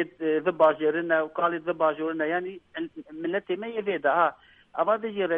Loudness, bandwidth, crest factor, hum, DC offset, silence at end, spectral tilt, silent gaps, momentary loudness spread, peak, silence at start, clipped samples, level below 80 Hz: -26 LUFS; 3.8 kHz; 20 dB; none; under 0.1%; 0 s; -8 dB/octave; none; 14 LU; -6 dBFS; 0 s; under 0.1%; -72 dBFS